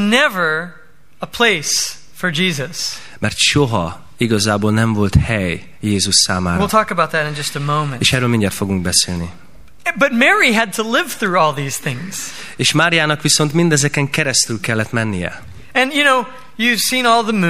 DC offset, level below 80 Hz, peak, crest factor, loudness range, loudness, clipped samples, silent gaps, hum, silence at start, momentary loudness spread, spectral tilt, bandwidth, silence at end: 2%; -38 dBFS; 0 dBFS; 16 dB; 2 LU; -15 LUFS; under 0.1%; none; none; 0 s; 11 LU; -3.5 dB/octave; 15.5 kHz; 0 s